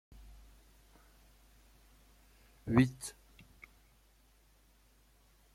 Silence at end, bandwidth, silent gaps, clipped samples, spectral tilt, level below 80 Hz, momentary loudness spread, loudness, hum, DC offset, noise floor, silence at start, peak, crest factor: 2.45 s; 15.5 kHz; none; under 0.1%; -6.5 dB/octave; -60 dBFS; 30 LU; -33 LUFS; none; under 0.1%; -67 dBFS; 2.65 s; -14 dBFS; 28 dB